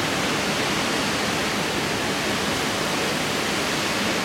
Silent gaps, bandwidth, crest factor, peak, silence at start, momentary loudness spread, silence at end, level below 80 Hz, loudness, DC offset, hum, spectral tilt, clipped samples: none; 16.5 kHz; 12 dB; -12 dBFS; 0 s; 1 LU; 0 s; -50 dBFS; -23 LUFS; under 0.1%; none; -3 dB/octave; under 0.1%